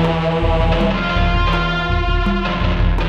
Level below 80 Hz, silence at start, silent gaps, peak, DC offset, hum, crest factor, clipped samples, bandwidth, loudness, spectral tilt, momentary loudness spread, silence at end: -20 dBFS; 0 s; none; -4 dBFS; under 0.1%; none; 12 dB; under 0.1%; 7 kHz; -17 LUFS; -7 dB/octave; 2 LU; 0 s